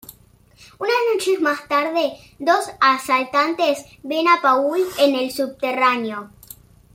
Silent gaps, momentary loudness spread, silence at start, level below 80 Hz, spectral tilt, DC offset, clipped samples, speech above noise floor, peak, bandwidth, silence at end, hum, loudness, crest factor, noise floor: none; 10 LU; 0.1 s; -60 dBFS; -3 dB/octave; under 0.1%; under 0.1%; 33 dB; -4 dBFS; 16.5 kHz; 0.7 s; none; -19 LUFS; 16 dB; -52 dBFS